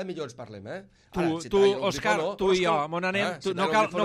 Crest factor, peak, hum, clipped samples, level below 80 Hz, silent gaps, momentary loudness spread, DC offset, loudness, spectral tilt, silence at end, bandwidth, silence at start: 14 dB; -12 dBFS; none; under 0.1%; -56 dBFS; none; 16 LU; under 0.1%; -25 LUFS; -5 dB/octave; 0 s; 13 kHz; 0 s